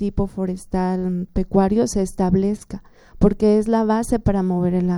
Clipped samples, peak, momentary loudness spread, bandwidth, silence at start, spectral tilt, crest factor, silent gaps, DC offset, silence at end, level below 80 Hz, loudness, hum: under 0.1%; -2 dBFS; 7 LU; 12.5 kHz; 0 s; -7.5 dB/octave; 16 dB; none; under 0.1%; 0 s; -34 dBFS; -20 LUFS; none